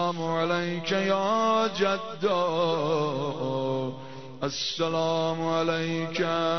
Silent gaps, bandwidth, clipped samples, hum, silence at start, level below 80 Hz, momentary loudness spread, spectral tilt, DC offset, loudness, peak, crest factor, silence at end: none; 6.6 kHz; under 0.1%; none; 0 s; -64 dBFS; 6 LU; -5 dB/octave; 0.5%; -27 LUFS; -12 dBFS; 14 dB; 0 s